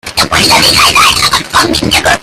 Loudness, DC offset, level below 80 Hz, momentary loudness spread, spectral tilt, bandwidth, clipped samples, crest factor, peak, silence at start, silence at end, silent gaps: -6 LUFS; under 0.1%; -30 dBFS; 5 LU; -2 dB/octave; over 20 kHz; 1%; 8 dB; 0 dBFS; 0.05 s; 0 s; none